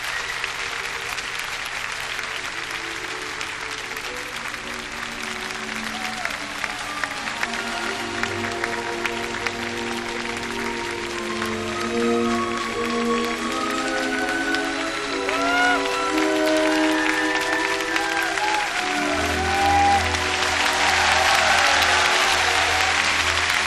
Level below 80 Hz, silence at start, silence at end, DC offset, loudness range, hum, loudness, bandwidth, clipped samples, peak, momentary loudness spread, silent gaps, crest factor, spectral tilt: -46 dBFS; 0 s; 0 s; under 0.1%; 10 LU; none; -22 LUFS; 14 kHz; under 0.1%; -4 dBFS; 11 LU; none; 18 dB; -2 dB/octave